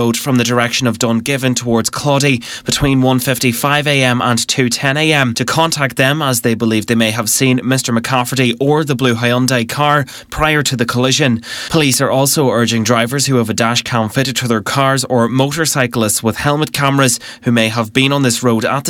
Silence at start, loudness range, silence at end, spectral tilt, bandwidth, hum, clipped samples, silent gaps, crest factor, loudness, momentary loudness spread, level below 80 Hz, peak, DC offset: 0 s; 1 LU; 0 s; -4 dB/octave; 19 kHz; none; under 0.1%; none; 14 dB; -13 LUFS; 3 LU; -42 dBFS; 0 dBFS; under 0.1%